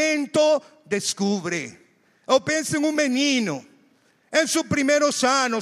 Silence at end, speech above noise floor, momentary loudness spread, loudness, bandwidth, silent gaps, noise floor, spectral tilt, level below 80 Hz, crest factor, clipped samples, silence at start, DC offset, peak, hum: 0 s; 39 dB; 9 LU; -22 LUFS; 15 kHz; none; -61 dBFS; -3 dB/octave; -66 dBFS; 16 dB; under 0.1%; 0 s; under 0.1%; -6 dBFS; none